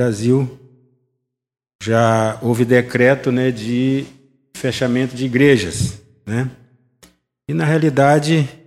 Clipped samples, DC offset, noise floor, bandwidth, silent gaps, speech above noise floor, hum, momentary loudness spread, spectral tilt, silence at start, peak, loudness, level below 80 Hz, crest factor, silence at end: under 0.1%; under 0.1%; -74 dBFS; 15 kHz; 1.75-1.79 s; 59 dB; none; 12 LU; -6.5 dB/octave; 0 s; 0 dBFS; -17 LUFS; -50 dBFS; 18 dB; 0.1 s